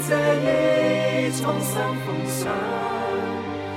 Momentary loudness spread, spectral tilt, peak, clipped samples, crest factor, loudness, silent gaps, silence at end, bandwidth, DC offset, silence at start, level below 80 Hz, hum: 7 LU; -5 dB/octave; -8 dBFS; under 0.1%; 14 dB; -23 LUFS; none; 0 s; 16.5 kHz; under 0.1%; 0 s; -58 dBFS; none